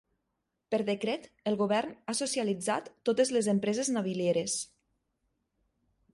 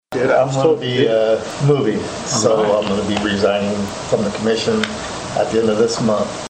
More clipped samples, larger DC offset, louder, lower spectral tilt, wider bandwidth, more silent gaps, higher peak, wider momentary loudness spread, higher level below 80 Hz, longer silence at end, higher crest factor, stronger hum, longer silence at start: neither; neither; second, -31 LUFS vs -17 LUFS; about the same, -4 dB/octave vs -5 dB/octave; first, 11.5 kHz vs 9.4 kHz; neither; second, -14 dBFS vs 0 dBFS; about the same, 7 LU vs 6 LU; second, -74 dBFS vs -46 dBFS; first, 1.5 s vs 0 s; about the same, 18 dB vs 16 dB; neither; first, 0.7 s vs 0.1 s